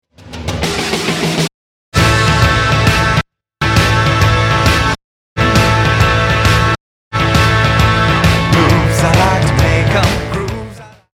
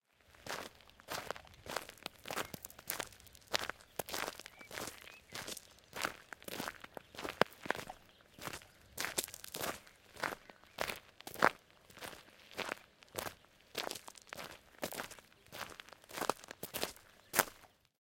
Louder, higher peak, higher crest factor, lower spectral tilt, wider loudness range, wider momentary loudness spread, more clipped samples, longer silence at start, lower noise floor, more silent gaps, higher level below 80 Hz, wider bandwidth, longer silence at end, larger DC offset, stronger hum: first, -12 LUFS vs -42 LUFS; first, 0 dBFS vs -6 dBFS; second, 12 dB vs 38 dB; first, -5 dB/octave vs -2 dB/octave; second, 2 LU vs 5 LU; second, 10 LU vs 17 LU; neither; about the same, 0.25 s vs 0.3 s; second, -31 dBFS vs -61 dBFS; first, 1.54-1.92 s, 5.04-5.36 s, 6.80-7.11 s vs none; first, -24 dBFS vs -70 dBFS; about the same, 16 kHz vs 17 kHz; about the same, 0.3 s vs 0.35 s; neither; neither